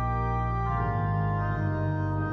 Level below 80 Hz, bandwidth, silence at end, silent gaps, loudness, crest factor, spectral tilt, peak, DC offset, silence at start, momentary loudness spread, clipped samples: -36 dBFS; 6 kHz; 0 s; none; -28 LUFS; 10 dB; -10 dB/octave; -16 dBFS; under 0.1%; 0 s; 1 LU; under 0.1%